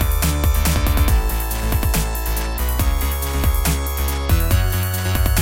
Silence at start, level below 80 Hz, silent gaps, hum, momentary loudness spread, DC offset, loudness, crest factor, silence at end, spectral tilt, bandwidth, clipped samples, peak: 0 s; -20 dBFS; none; none; 4 LU; under 0.1%; -20 LUFS; 14 dB; 0 s; -4.5 dB/octave; 17.5 kHz; under 0.1%; -4 dBFS